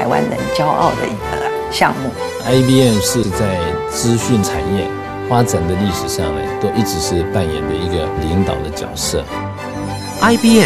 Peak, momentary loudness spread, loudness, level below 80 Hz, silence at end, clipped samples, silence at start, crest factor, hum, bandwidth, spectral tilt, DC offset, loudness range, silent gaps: 0 dBFS; 10 LU; -16 LUFS; -34 dBFS; 0 s; under 0.1%; 0 s; 16 dB; none; 15.5 kHz; -5 dB/octave; 0.2%; 3 LU; none